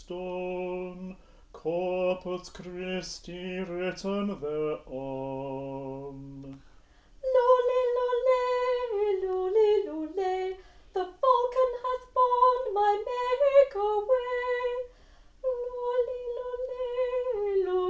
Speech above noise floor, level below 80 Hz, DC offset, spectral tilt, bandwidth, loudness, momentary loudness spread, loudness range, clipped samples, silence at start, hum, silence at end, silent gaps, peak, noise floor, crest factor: 26 dB; -58 dBFS; under 0.1%; -6 dB/octave; 8 kHz; -28 LUFS; 15 LU; 9 LU; under 0.1%; 0 s; none; 0 s; none; -10 dBFS; -56 dBFS; 18 dB